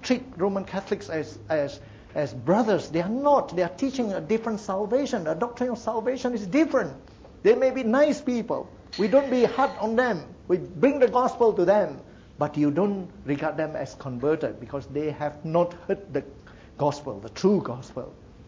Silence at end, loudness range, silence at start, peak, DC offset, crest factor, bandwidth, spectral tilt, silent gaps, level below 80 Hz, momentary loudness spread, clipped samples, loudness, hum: 0 s; 5 LU; 0 s; -8 dBFS; under 0.1%; 16 dB; 7.8 kHz; -6.5 dB/octave; none; -56 dBFS; 12 LU; under 0.1%; -25 LUFS; none